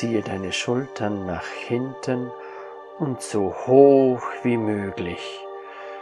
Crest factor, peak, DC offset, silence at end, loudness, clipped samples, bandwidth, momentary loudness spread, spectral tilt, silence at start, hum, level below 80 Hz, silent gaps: 22 dB; -2 dBFS; under 0.1%; 0 s; -22 LUFS; under 0.1%; 11.5 kHz; 22 LU; -6 dB/octave; 0 s; none; -64 dBFS; none